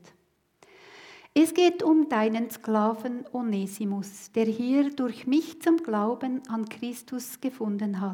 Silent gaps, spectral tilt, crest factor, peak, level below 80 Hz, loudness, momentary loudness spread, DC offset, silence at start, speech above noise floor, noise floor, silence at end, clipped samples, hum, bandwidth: none; -5.5 dB/octave; 18 dB; -10 dBFS; -80 dBFS; -27 LUFS; 12 LU; under 0.1%; 0.9 s; 41 dB; -67 dBFS; 0 s; under 0.1%; none; 18 kHz